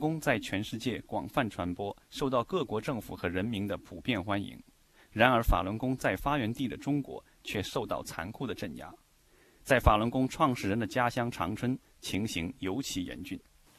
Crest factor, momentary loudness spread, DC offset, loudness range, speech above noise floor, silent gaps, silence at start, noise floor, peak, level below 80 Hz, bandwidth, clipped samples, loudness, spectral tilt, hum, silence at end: 26 dB; 13 LU; under 0.1%; 4 LU; 32 dB; none; 0 s; -64 dBFS; -8 dBFS; -44 dBFS; 14 kHz; under 0.1%; -32 LUFS; -5.5 dB/octave; none; 0.4 s